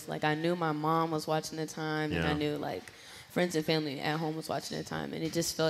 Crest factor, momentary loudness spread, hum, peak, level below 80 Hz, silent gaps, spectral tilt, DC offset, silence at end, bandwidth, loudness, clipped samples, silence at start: 18 dB; 8 LU; none; -14 dBFS; -60 dBFS; none; -5 dB/octave; under 0.1%; 0 s; 16 kHz; -33 LUFS; under 0.1%; 0 s